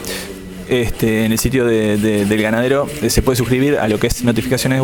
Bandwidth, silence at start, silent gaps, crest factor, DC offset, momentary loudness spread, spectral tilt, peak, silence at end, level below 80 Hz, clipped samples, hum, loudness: 18 kHz; 0 s; none; 14 dB; under 0.1%; 4 LU; -5 dB/octave; 0 dBFS; 0 s; -30 dBFS; under 0.1%; none; -16 LUFS